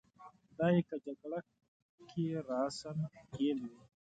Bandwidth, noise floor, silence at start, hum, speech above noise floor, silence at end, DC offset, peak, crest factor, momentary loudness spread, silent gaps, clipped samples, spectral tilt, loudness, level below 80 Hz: 9 kHz; -60 dBFS; 0.2 s; none; 23 dB; 0.35 s; under 0.1%; -20 dBFS; 18 dB; 13 LU; 1.68-1.98 s; under 0.1%; -7 dB/octave; -38 LUFS; -74 dBFS